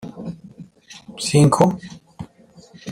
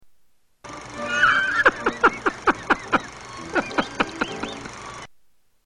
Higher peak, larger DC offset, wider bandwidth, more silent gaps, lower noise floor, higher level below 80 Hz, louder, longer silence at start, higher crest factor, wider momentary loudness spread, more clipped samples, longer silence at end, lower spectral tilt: about the same, -2 dBFS vs -2 dBFS; neither; first, 15 kHz vs 10.5 kHz; neither; second, -48 dBFS vs -60 dBFS; about the same, -54 dBFS vs -50 dBFS; first, -17 LUFS vs -22 LUFS; about the same, 0.05 s vs 0.05 s; about the same, 20 dB vs 22 dB; first, 25 LU vs 19 LU; neither; second, 0 s vs 0.55 s; first, -6 dB/octave vs -3.5 dB/octave